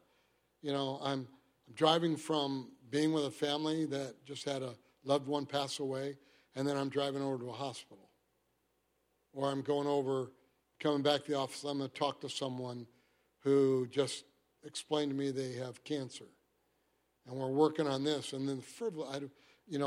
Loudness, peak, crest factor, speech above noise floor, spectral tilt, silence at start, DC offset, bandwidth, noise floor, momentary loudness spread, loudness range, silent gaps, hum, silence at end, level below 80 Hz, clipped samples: -36 LUFS; -14 dBFS; 22 dB; 43 dB; -5 dB/octave; 0.65 s; under 0.1%; 15.5 kHz; -78 dBFS; 14 LU; 5 LU; none; none; 0 s; -82 dBFS; under 0.1%